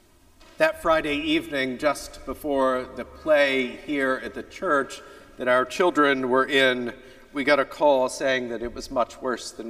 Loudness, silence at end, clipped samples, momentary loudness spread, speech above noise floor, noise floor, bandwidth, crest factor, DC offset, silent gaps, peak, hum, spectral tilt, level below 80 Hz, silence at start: -23 LUFS; 0 s; under 0.1%; 13 LU; 30 dB; -53 dBFS; 15.5 kHz; 20 dB; under 0.1%; none; -4 dBFS; none; -3.5 dB/octave; -52 dBFS; 0.6 s